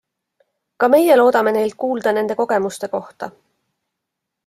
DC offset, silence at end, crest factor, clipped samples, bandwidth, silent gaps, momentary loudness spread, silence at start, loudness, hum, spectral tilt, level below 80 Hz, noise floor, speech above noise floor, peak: under 0.1%; 1.15 s; 16 dB; under 0.1%; 16 kHz; none; 16 LU; 0.8 s; -17 LUFS; none; -5 dB/octave; -66 dBFS; -80 dBFS; 64 dB; -2 dBFS